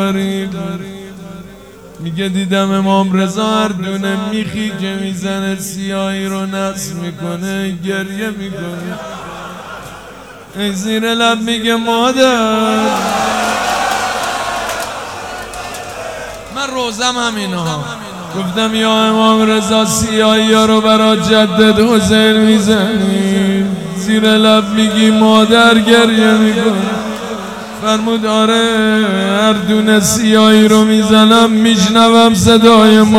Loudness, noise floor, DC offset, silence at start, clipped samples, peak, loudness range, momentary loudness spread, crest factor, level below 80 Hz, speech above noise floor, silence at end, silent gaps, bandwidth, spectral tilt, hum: -11 LUFS; -35 dBFS; 0.2%; 0 s; 0.2%; 0 dBFS; 10 LU; 16 LU; 12 dB; -44 dBFS; 24 dB; 0 s; none; 16 kHz; -4.5 dB/octave; none